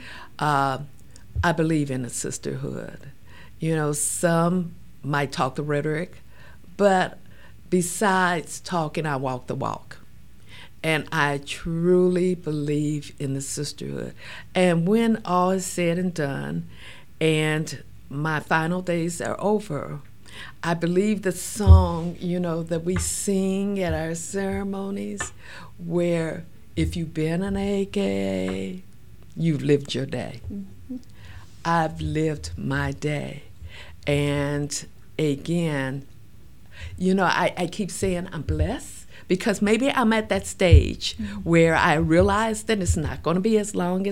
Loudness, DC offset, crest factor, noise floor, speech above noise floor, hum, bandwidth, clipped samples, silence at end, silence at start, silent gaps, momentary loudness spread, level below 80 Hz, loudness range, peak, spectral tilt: -24 LUFS; 0.8%; 24 dB; -50 dBFS; 27 dB; none; 16.5 kHz; under 0.1%; 0 s; 0 s; none; 16 LU; -36 dBFS; 6 LU; 0 dBFS; -5.5 dB/octave